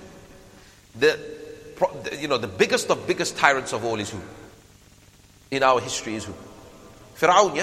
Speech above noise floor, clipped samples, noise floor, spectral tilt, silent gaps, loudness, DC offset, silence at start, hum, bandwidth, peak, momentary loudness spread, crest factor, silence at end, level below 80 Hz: 30 dB; under 0.1%; -52 dBFS; -3 dB/octave; none; -23 LUFS; under 0.1%; 0 s; none; 15.5 kHz; 0 dBFS; 19 LU; 24 dB; 0 s; -58 dBFS